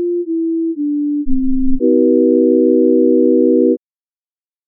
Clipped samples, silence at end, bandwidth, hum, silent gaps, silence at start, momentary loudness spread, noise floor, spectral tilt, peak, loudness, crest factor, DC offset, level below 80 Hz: under 0.1%; 0.9 s; 0.6 kHz; none; none; 0 s; 7 LU; under -90 dBFS; -12 dB/octave; -2 dBFS; -14 LUFS; 12 dB; under 0.1%; -30 dBFS